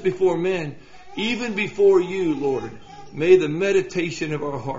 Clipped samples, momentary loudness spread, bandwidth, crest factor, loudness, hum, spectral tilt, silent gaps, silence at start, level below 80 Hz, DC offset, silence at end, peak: under 0.1%; 12 LU; 7.8 kHz; 18 dB; -21 LUFS; none; -5 dB/octave; none; 0 s; -54 dBFS; 0.7%; 0 s; -4 dBFS